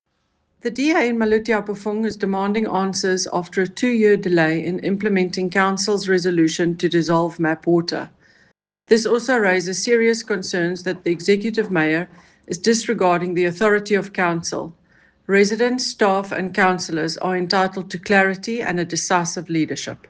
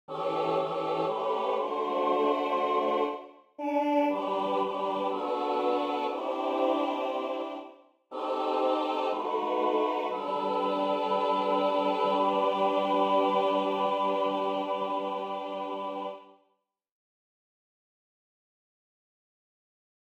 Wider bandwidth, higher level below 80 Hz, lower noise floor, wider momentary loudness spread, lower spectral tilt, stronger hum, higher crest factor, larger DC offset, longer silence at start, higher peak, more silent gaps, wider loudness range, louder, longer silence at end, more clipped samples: second, 10 kHz vs 14.5 kHz; first, -60 dBFS vs -80 dBFS; second, -69 dBFS vs -75 dBFS; about the same, 7 LU vs 8 LU; second, -4.5 dB/octave vs -6 dB/octave; neither; about the same, 18 dB vs 16 dB; neither; first, 0.65 s vs 0.1 s; first, -2 dBFS vs -14 dBFS; neither; second, 2 LU vs 8 LU; first, -19 LUFS vs -29 LUFS; second, 0.15 s vs 3.75 s; neither